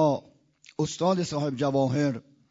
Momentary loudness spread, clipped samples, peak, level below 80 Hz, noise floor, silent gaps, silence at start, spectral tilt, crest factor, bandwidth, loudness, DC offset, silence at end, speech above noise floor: 9 LU; under 0.1%; -12 dBFS; -64 dBFS; -57 dBFS; none; 0 s; -6.5 dB/octave; 16 dB; 7.8 kHz; -27 LUFS; under 0.1%; 0.3 s; 31 dB